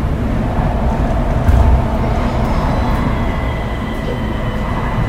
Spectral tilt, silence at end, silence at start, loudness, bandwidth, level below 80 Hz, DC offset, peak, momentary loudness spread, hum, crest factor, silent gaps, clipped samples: -8 dB/octave; 0 s; 0 s; -17 LUFS; 14 kHz; -18 dBFS; under 0.1%; 0 dBFS; 7 LU; none; 14 dB; none; under 0.1%